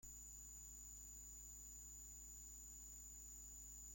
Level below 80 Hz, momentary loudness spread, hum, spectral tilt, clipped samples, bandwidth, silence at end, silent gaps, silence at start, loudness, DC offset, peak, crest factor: -64 dBFS; 0 LU; 50 Hz at -65 dBFS; -2 dB/octave; under 0.1%; 16.5 kHz; 0 s; none; 0 s; -55 LUFS; under 0.1%; -46 dBFS; 10 dB